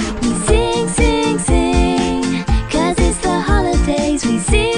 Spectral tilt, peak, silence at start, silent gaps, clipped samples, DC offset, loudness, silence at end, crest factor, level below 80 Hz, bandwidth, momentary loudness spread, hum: -5 dB/octave; 0 dBFS; 0 s; none; under 0.1%; under 0.1%; -16 LUFS; 0 s; 14 dB; -20 dBFS; 10.5 kHz; 3 LU; none